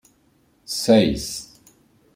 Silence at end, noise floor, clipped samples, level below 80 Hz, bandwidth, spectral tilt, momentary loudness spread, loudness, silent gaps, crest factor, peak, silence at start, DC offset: 0.7 s; -61 dBFS; under 0.1%; -46 dBFS; 16 kHz; -4.5 dB/octave; 14 LU; -20 LUFS; none; 20 dB; -4 dBFS; 0.7 s; under 0.1%